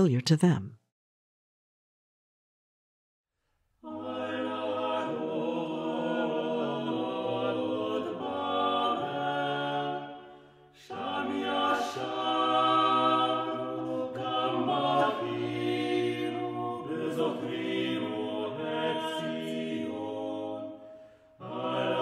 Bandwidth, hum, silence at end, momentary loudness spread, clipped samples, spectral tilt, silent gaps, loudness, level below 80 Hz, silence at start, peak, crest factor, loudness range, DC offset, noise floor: 14 kHz; none; 0 s; 11 LU; under 0.1%; -6 dB/octave; 0.92-3.24 s; -30 LUFS; -76 dBFS; 0 s; -10 dBFS; 20 dB; 7 LU; under 0.1%; -77 dBFS